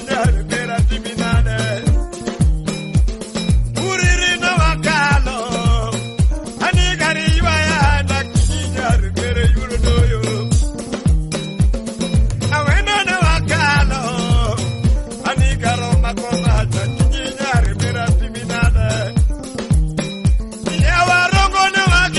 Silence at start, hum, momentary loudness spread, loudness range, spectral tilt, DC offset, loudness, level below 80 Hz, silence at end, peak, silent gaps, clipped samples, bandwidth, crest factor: 0 s; none; 6 LU; 2 LU; -5 dB/octave; under 0.1%; -17 LUFS; -20 dBFS; 0 s; -4 dBFS; none; under 0.1%; 11.5 kHz; 12 dB